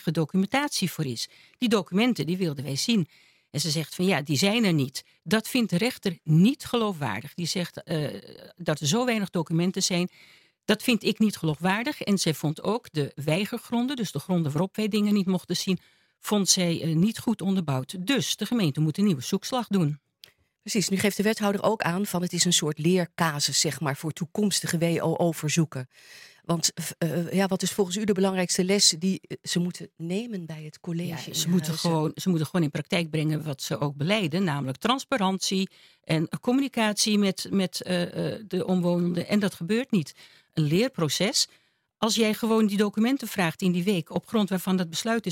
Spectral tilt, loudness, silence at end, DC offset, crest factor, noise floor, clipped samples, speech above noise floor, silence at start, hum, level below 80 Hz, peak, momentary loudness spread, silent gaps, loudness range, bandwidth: -4.5 dB/octave; -26 LUFS; 0 s; under 0.1%; 20 dB; -56 dBFS; under 0.1%; 30 dB; 0 s; none; -68 dBFS; -6 dBFS; 8 LU; none; 3 LU; 17 kHz